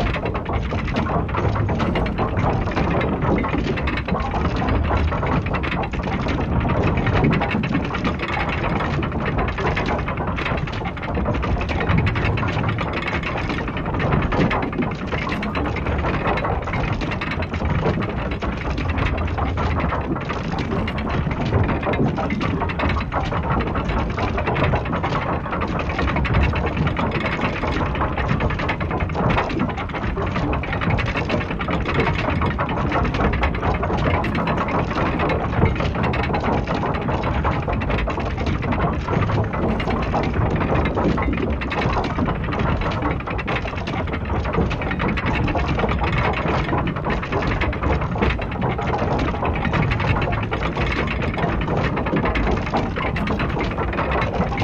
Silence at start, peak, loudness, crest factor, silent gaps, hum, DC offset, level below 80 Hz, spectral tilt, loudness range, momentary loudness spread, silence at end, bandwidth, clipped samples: 0 s; -2 dBFS; -22 LUFS; 18 dB; none; none; under 0.1%; -28 dBFS; -7.5 dB/octave; 2 LU; 4 LU; 0 s; 7.6 kHz; under 0.1%